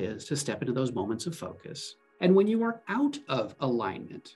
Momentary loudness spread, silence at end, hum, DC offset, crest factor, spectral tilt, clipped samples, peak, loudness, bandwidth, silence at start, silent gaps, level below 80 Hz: 17 LU; 0.05 s; none; under 0.1%; 18 dB; -5.5 dB/octave; under 0.1%; -12 dBFS; -29 LUFS; 12.5 kHz; 0 s; none; -72 dBFS